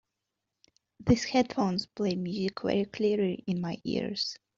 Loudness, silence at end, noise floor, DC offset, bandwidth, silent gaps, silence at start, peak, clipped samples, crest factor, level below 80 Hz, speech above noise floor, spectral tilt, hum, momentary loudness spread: -30 LUFS; 0.2 s; -86 dBFS; under 0.1%; 7.6 kHz; none; 1 s; -10 dBFS; under 0.1%; 20 dB; -56 dBFS; 56 dB; -5 dB/octave; none; 6 LU